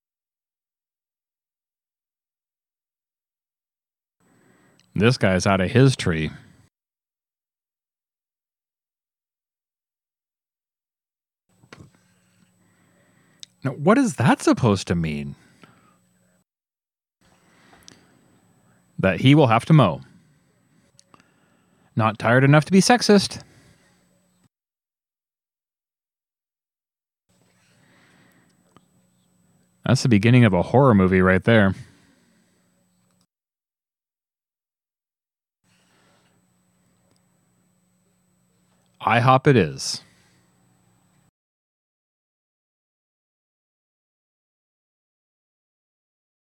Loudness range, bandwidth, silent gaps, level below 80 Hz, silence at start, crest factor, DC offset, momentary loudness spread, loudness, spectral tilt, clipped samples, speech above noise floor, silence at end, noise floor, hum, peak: 11 LU; 13.5 kHz; none; -60 dBFS; 4.95 s; 22 dB; under 0.1%; 15 LU; -18 LUFS; -6 dB/octave; under 0.1%; over 73 dB; 6.5 s; under -90 dBFS; none; -2 dBFS